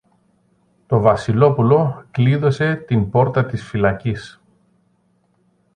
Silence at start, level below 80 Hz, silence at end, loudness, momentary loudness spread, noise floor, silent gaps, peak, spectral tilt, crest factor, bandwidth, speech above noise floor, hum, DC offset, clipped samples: 0.9 s; -46 dBFS; 1.45 s; -17 LUFS; 8 LU; -62 dBFS; none; 0 dBFS; -8.5 dB/octave; 18 dB; 9.4 kHz; 45 dB; none; under 0.1%; under 0.1%